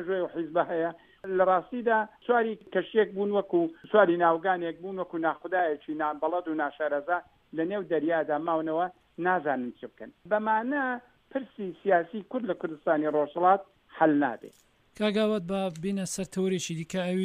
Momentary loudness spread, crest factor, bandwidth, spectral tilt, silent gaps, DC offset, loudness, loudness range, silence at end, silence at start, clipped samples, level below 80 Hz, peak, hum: 10 LU; 20 dB; 15 kHz; -5.5 dB/octave; none; under 0.1%; -28 LUFS; 4 LU; 0 s; 0 s; under 0.1%; -70 dBFS; -8 dBFS; none